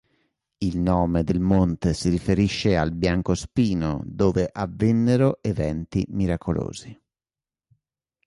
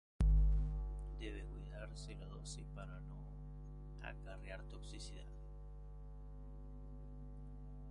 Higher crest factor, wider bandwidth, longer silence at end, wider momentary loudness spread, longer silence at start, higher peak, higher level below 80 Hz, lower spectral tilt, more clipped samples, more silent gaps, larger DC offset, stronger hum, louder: about the same, 16 dB vs 20 dB; about the same, 11.5 kHz vs 10.5 kHz; first, 1.35 s vs 0 s; second, 7 LU vs 18 LU; first, 0.6 s vs 0.2 s; first, -6 dBFS vs -22 dBFS; about the same, -38 dBFS vs -42 dBFS; about the same, -7 dB/octave vs -6 dB/octave; neither; neither; neither; second, none vs 50 Hz at -50 dBFS; first, -23 LUFS vs -46 LUFS